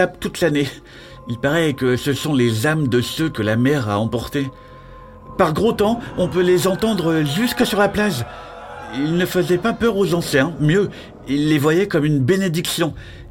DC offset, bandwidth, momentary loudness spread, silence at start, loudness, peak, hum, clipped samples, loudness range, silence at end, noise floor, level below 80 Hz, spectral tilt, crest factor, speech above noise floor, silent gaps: 0.1%; 16.5 kHz; 10 LU; 0 s; -19 LUFS; -2 dBFS; none; under 0.1%; 2 LU; 0 s; -39 dBFS; -44 dBFS; -5.5 dB/octave; 16 dB; 21 dB; none